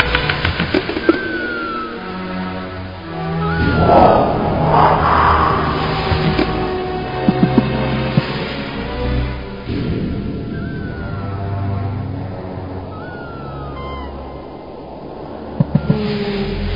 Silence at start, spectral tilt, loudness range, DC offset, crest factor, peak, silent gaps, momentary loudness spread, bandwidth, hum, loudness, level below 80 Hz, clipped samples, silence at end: 0 s; -9 dB/octave; 12 LU; 0.4%; 18 dB; 0 dBFS; none; 17 LU; 5.4 kHz; none; -18 LUFS; -30 dBFS; under 0.1%; 0 s